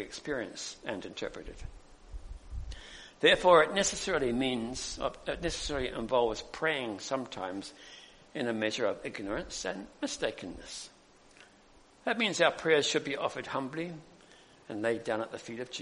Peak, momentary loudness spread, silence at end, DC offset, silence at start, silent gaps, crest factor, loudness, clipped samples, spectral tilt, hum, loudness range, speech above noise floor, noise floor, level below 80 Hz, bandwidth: -8 dBFS; 20 LU; 0 s; under 0.1%; 0 s; none; 24 dB; -31 LUFS; under 0.1%; -3 dB/octave; none; 8 LU; 28 dB; -60 dBFS; -52 dBFS; 10.5 kHz